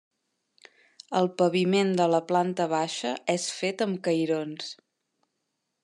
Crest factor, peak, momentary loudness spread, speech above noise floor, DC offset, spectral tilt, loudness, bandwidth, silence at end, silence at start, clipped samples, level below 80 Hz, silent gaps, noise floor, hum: 18 dB; -10 dBFS; 8 LU; 54 dB; under 0.1%; -5 dB/octave; -26 LUFS; 11.5 kHz; 1.1 s; 1.1 s; under 0.1%; -84 dBFS; none; -80 dBFS; none